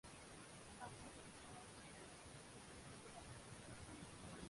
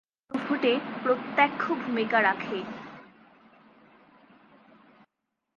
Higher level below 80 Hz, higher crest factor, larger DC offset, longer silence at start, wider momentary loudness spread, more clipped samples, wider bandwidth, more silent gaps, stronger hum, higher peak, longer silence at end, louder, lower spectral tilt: first, -70 dBFS vs -76 dBFS; second, 16 dB vs 22 dB; neither; second, 0.05 s vs 0.3 s; second, 2 LU vs 16 LU; neither; first, 11.5 kHz vs 7 kHz; neither; neither; second, -40 dBFS vs -8 dBFS; second, 0 s vs 2.5 s; second, -57 LUFS vs -27 LUFS; second, -3.5 dB/octave vs -6 dB/octave